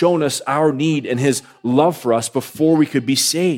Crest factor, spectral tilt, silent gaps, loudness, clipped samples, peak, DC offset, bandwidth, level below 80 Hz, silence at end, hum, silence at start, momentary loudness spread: 14 dB; -4.5 dB/octave; none; -17 LUFS; under 0.1%; -2 dBFS; under 0.1%; 17 kHz; -66 dBFS; 0 s; none; 0 s; 4 LU